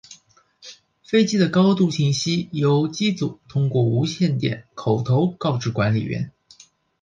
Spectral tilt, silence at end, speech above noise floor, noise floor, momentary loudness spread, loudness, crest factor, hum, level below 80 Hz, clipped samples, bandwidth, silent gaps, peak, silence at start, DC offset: -6.5 dB/octave; 0.7 s; 35 dB; -55 dBFS; 9 LU; -21 LUFS; 16 dB; none; -56 dBFS; under 0.1%; 9.4 kHz; none; -6 dBFS; 0.1 s; under 0.1%